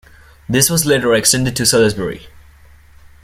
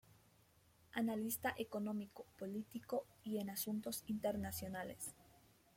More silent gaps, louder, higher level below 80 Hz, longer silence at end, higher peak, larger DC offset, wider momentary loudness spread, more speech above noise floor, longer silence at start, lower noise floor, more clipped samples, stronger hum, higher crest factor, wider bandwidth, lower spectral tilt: neither; first, -14 LUFS vs -44 LUFS; first, -42 dBFS vs -74 dBFS; first, 0.85 s vs 0.4 s; first, 0 dBFS vs -26 dBFS; neither; first, 12 LU vs 8 LU; about the same, 29 dB vs 28 dB; second, 0.5 s vs 0.95 s; second, -44 dBFS vs -72 dBFS; neither; neither; about the same, 16 dB vs 18 dB; about the same, 16.5 kHz vs 16.5 kHz; about the same, -3.5 dB/octave vs -4.5 dB/octave